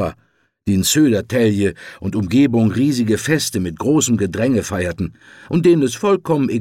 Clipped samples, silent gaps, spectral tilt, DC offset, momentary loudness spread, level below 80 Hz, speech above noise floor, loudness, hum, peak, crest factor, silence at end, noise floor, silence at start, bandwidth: under 0.1%; none; -5 dB/octave; under 0.1%; 9 LU; -46 dBFS; 43 dB; -17 LUFS; none; -4 dBFS; 14 dB; 0 s; -60 dBFS; 0 s; 17 kHz